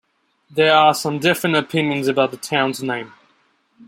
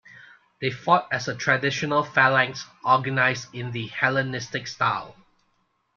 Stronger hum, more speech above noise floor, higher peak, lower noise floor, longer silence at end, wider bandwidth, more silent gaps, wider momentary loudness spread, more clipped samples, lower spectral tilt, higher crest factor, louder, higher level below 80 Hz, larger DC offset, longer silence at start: neither; about the same, 43 dB vs 46 dB; about the same, -2 dBFS vs -4 dBFS; second, -61 dBFS vs -70 dBFS; second, 0.05 s vs 0.85 s; first, 16.5 kHz vs 7.4 kHz; neither; about the same, 13 LU vs 12 LU; neither; about the same, -4.5 dB/octave vs -4.5 dB/octave; about the same, 18 dB vs 22 dB; first, -18 LUFS vs -23 LUFS; about the same, -66 dBFS vs -64 dBFS; neither; first, 0.55 s vs 0.15 s